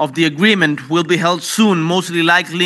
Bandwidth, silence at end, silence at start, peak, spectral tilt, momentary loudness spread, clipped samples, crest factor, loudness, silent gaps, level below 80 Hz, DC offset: 12.5 kHz; 0 s; 0 s; 0 dBFS; -4.5 dB/octave; 4 LU; under 0.1%; 14 dB; -14 LUFS; none; -72 dBFS; under 0.1%